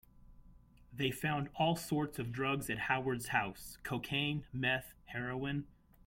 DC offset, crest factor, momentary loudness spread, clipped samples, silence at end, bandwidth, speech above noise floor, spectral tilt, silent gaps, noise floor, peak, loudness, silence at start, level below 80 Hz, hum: under 0.1%; 20 dB; 8 LU; under 0.1%; 0.35 s; 16.5 kHz; 24 dB; -5 dB/octave; none; -61 dBFS; -18 dBFS; -37 LUFS; 0.15 s; -62 dBFS; none